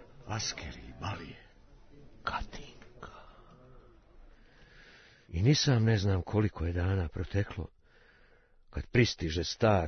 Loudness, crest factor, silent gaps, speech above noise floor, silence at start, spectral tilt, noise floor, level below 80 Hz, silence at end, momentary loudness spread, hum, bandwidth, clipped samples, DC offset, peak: -32 LUFS; 22 dB; none; 31 dB; 0 s; -5.5 dB/octave; -62 dBFS; -50 dBFS; 0 s; 22 LU; none; 6.6 kHz; under 0.1%; under 0.1%; -10 dBFS